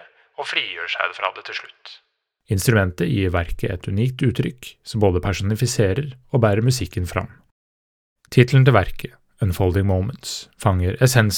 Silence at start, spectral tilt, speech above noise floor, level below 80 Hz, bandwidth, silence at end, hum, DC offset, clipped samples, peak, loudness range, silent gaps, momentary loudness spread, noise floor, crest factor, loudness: 0.4 s; -5.5 dB/octave; over 70 dB; -42 dBFS; 17.5 kHz; 0 s; none; under 0.1%; under 0.1%; 0 dBFS; 3 LU; 7.51-8.16 s; 14 LU; under -90 dBFS; 20 dB; -21 LUFS